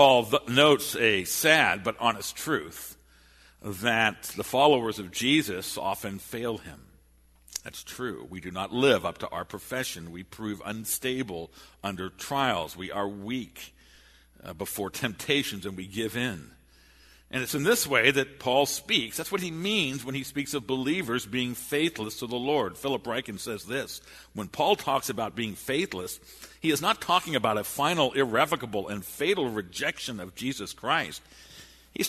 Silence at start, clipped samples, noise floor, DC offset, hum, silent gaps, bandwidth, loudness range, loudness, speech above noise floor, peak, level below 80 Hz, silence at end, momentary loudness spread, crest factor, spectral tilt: 0 s; under 0.1%; -60 dBFS; under 0.1%; none; none; 13.5 kHz; 7 LU; -27 LUFS; 32 dB; -4 dBFS; -60 dBFS; 0 s; 16 LU; 26 dB; -3.5 dB/octave